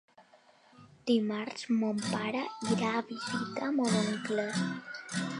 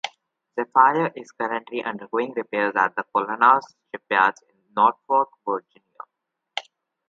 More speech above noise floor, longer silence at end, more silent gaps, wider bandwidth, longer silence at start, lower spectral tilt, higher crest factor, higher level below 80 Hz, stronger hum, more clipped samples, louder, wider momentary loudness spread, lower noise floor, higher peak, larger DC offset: second, 30 dB vs 59 dB; second, 0 s vs 0.45 s; neither; first, 11.5 kHz vs 7.6 kHz; first, 0.2 s vs 0.05 s; about the same, -5 dB/octave vs -5 dB/octave; second, 16 dB vs 22 dB; about the same, -78 dBFS vs -80 dBFS; neither; neither; second, -32 LUFS vs -22 LUFS; second, 7 LU vs 16 LU; second, -62 dBFS vs -81 dBFS; second, -16 dBFS vs -2 dBFS; neither